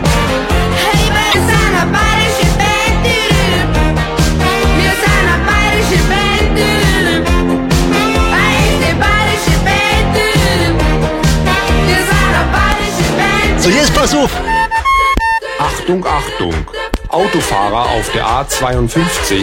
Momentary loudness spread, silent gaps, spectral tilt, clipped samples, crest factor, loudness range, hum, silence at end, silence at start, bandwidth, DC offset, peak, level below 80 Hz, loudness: 4 LU; none; -4.5 dB/octave; under 0.1%; 12 dB; 3 LU; none; 0 s; 0 s; 16.5 kHz; under 0.1%; 0 dBFS; -18 dBFS; -12 LUFS